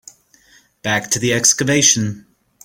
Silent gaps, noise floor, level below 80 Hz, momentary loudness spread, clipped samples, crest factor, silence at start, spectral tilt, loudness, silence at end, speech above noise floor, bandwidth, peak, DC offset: none; -52 dBFS; -54 dBFS; 14 LU; under 0.1%; 18 dB; 0.85 s; -2.5 dB/octave; -14 LUFS; 0.45 s; 36 dB; 17 kHz; 0 dBFS; under 0.1%